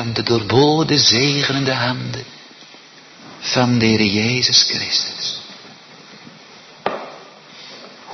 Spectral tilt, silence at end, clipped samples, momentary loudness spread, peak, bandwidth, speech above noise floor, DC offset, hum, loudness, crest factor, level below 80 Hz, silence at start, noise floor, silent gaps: -3.5 dB/octave; 0 s; under 0.1%; 24 LU; 0 dBFS; 6.4 kHz; 26 dB; under 0.1%; none; -16 LUFS; 18 dB; -54 dBFS; 0 s; -43 dBFS; none